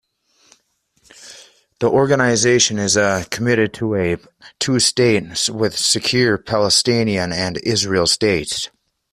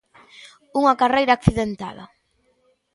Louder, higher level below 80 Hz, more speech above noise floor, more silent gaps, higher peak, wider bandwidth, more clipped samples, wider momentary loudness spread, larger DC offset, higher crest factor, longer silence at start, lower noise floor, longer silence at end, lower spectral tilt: first, -16 LUFS vs -19 LUFS; second, -50 dBFS vs -42 dBFS; about the same, 46 dB vs 46 dB; neither; about the same, 0 dBFS vs 0 dBFS; first, 15 kHz vs 11.5 kHz; neither; second, 7 LU vs 14 LU; neither; about the same, 18 dB vs 22 dB; first, 1.2 s vs 0.45 s; about the same, -63 dBFS vs -65 dBFS; second, 0.45 s vs 0.9 s; second, -3.5 dB/octave vs -6.5 dB/octave